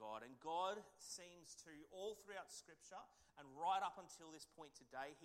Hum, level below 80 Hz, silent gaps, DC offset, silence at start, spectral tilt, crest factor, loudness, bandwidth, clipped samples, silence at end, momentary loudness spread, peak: none; -86 dBFS; none; under 0.1%; 0 s; -2 dB/octave; 20 dB; -51 LUFS; 16 kHz; under 0.1%; 0 s; 16 LU; -32 dBFS